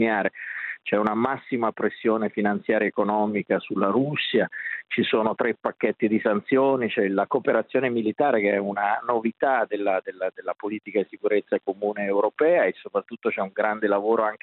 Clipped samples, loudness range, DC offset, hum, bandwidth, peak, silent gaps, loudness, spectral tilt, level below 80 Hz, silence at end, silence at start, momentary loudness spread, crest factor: under 0.1%; 2 LU; under 0.1%; none; 4.3 kHz; -6 dBFS; none; -24 LUFS; -9 dB/octave; -74 dBFS; 0.05 s; 0 s; 6 LU; 18 dB